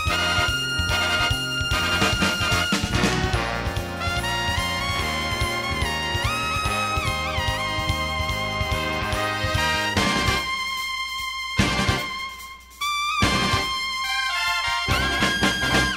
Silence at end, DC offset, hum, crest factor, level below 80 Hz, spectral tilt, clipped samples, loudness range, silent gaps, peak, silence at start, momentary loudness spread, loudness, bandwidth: 0 s; under 0.1%; none; 18 dB; -34 dBFS; -3.5 dB/octave; under 0.1%; 3 LU; none; -6 dBFS; 0 s; 6 LU; -22 LUFS; 16 kHz